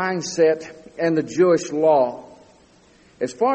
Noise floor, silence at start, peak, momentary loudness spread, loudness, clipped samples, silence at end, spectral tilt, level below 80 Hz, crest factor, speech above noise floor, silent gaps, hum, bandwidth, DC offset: -53 dBFS; 0 s; -6 dBFS; 12 LU; -20 LUFS; under 0.1%; 0 s; -5 dB/octave; -64 dBFS; 16 dB; 34 dB; none; none; 8.4 kHz; under 0.1%